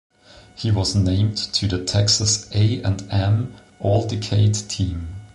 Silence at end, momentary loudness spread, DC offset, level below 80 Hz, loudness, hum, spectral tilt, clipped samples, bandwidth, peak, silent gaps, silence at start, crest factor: 0.1 s; 8 LU; under 0.1%; -36 dBFS; -20 LUFS; none; -4.5 dB/octave; under 0.1%; 11 kHz; -6 dBFS; none; 0.55 s; 16 dB